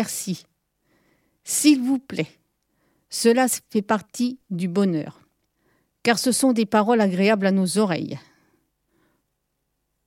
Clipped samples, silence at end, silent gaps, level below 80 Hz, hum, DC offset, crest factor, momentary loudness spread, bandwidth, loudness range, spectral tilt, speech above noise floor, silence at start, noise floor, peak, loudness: under 0.1%; 1.9 s; none; -72 dBFS; none; under 0.1%; 20 dB; 13 LU; 16.5 kHz; 3 LU; -4.5 dB/octave; 54 dB; 0 s; -75 dBFS; -4 dBFS; -21 LUFS